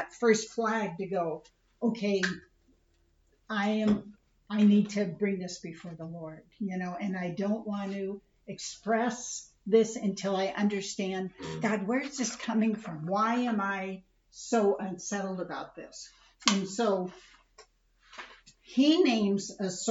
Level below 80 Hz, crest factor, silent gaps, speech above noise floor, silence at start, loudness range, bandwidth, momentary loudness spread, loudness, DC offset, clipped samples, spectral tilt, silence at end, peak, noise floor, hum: -68 dBFS; 26 dB; none; 38 dB; 0 s; 4 LU; 8 kHz; 17 LU; -30 LUFS; under 0.1%; under 0.1%; -4.5 dB/octave; 0 s; -4 dBFS; -68 dBFS; none